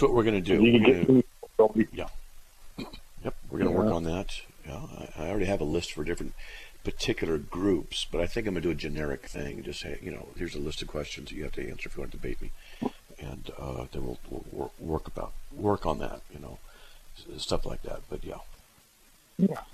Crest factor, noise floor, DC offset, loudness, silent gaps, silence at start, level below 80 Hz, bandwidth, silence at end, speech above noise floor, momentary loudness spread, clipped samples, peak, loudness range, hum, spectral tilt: 22 dB; -59 dBFS; under 0.1%; -30 LUFS; none; 0 s; -40 dBFS; 14.5 kHz; 0 s; 31 dB; 19 LU; under 0.1%; -6 dBFS; 11 LU; none; -6 dB/octave